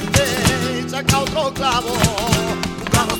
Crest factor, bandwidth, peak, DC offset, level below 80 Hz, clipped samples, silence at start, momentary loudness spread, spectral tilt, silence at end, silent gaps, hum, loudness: 18 dB; over 20 kHz; 0 dBFS; under 0.1%; -34 dBFS; under 0.1%; 0 s; 4 LU; -4 dB/octave; 0 s; none; none; -18 LUFS